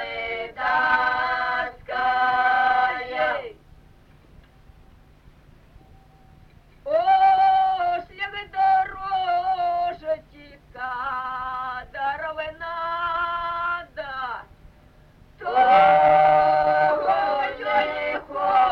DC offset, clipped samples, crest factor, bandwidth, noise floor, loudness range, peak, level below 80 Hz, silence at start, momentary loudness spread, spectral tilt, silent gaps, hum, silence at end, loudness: under 0.1%; under 0.1%; 18 dB; 5.8 kHz; -52 dBFS; 10 LU; -4 dBFS; -52 dBFS; 0 s; 14 LU; -5 dB/octave; none; none; 0 s; -22 LUFS